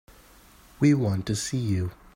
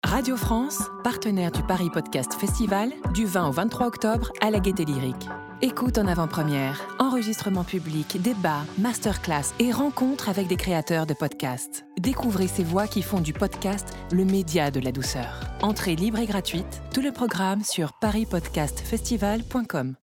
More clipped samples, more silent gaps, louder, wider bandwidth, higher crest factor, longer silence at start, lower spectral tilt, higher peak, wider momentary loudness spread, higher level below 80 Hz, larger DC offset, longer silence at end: neither; neither; about the same, -25 LUFS vs -26 LUFS; second, 16 kHz vs 18.5 kHz; about the same, 18 dB vs 18 dB; first, 0.8 s vs 0.05 s; about the same, -6 dB/octave vs -5 dB/octave; second, -10 dBFS vs -6 dBFS; about the same, 6 LU vs 5 LU; second, -54 dBFS vs -40 dBFS; neither; about the same, 0.2 s vs 0.1 s